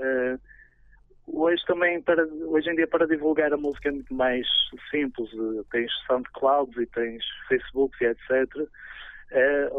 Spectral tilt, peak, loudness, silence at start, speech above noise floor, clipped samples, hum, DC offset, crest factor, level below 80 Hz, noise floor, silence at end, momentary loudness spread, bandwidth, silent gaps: -6.5 dB/octave; -8 dBFS; -25 LUFS; 0 s; 30 dB; under 0.1%; none; under 0.1%; 16 dB; -54 dBFS; -56 dBFS; 0 s; 9 LU; 4 kHz; none